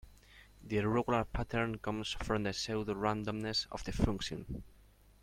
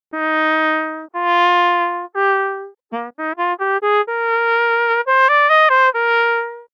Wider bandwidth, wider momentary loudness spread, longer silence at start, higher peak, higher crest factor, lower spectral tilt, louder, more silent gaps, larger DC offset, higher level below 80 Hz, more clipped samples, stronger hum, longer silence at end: first, 15.5 kHz vs 7.4 kHz; second, 8 LU vs 13 LU; about the same, 0.05 s vs 0.15 s; second, -14 dBFS vs -4 dBFS; first, 22 dB vs 12 dB; first, -5 dB/octave vs -2.5 dB/octave; second, -36 LUFS vs -16 LUFS; neither; neither; first, -48 dBFS vs under -90 dBFS; neither; neither; first, 0.45 s vs 0.1 s